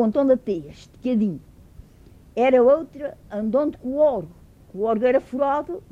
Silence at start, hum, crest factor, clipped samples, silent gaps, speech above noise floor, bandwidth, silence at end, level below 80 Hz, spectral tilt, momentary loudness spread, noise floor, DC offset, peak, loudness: 0 s; none; 16 dB; under 0.1%; none; 28 dB; 7.4 kHz; 0.1 s; -52 dBFS; -8 dB/octave; 16 LU; -49 dBFS; under 0.1%; -6 dBFS; -22 LUFS